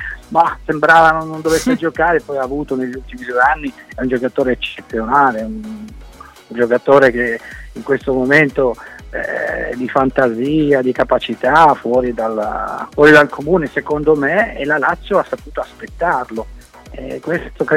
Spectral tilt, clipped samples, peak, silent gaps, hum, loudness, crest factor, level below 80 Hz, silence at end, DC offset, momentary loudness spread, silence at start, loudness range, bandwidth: -5.5 dB/octave; under 0.1%; 0 dBFS; none; none; -15 LUFS; 16 dB; -38 dBFS; 0 s; under 0.1%; 16 LU; 0 s; 5 LU; 16.5 kHz